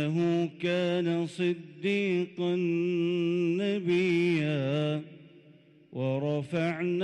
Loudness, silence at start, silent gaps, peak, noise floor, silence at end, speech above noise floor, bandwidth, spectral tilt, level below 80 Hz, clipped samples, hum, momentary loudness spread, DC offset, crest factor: -29 LUFS; 0 s; none; -18 dBFS; -57 dBFS; 0 s; 29 dB; 9.2 kHz; -7.5 dB/octave; -76 dBFS; under 0.1%; none; 6 LU; under 0.1%; 10 dB